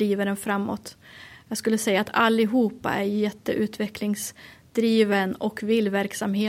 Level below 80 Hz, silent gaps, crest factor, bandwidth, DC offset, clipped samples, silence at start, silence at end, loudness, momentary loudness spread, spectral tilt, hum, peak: -62 dBFS; none; 18 dB; 16 kHz; under 0.1%; under 0.1%; 0 s; 0 s; -24 LUFS; 13 LU; -5 dB/octave; none; -6 dBFS